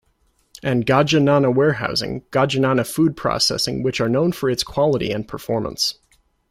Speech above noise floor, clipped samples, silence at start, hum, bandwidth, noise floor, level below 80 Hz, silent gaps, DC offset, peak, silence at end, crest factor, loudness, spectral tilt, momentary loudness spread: 44 dB; under 0.1%; 0.65 s; none; 16 kHz; -63 dBFS; -48 dBFS; none; under 0.1%; -4 dBFS; 0.6 s; 16 dB; -19 LUFS; -5 dB/octave; 8 LU